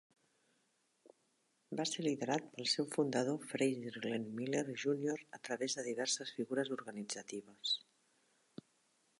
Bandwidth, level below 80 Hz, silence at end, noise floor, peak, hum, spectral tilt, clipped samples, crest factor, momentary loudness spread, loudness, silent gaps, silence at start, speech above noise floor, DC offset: 11.5 kHz; -90 dBFS; 1.4 s; -79 dBFS; -20 dBFS; none; -3.5 dB/octave; under 0.1%; 20 dB; 9 LU; -39 LUFS; none; 1.05 s; 40 dB; under 0.1%